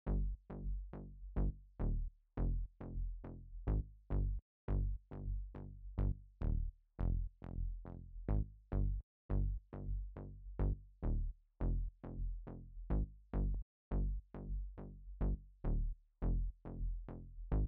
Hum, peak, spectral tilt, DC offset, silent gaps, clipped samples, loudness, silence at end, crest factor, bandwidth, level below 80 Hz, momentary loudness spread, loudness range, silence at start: none; -26 dBFS; -11 dB/octave; under 0.1%; 4.42-4.68 s, 9.03-9.29 s, 13.62-13.91 s; under 0.1%; -44 LUFS; 0 s; 14 dB; 2.5 kHz; -42 dBFS; 10 LU; 2 LU; 0.05 s